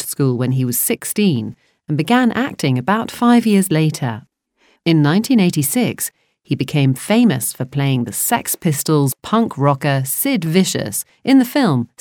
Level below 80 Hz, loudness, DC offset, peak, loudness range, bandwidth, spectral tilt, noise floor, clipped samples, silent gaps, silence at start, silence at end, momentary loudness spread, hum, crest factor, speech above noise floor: -60 dBFS; -16 LUFS; under 0.1%; -2 dBFS; 2 LU; 20 kHz; -5 dB/octave; -59 dBFS; under 0.1%; none; 0 s; 0.15 s; 9 LU; none; 14 dB; 43 dB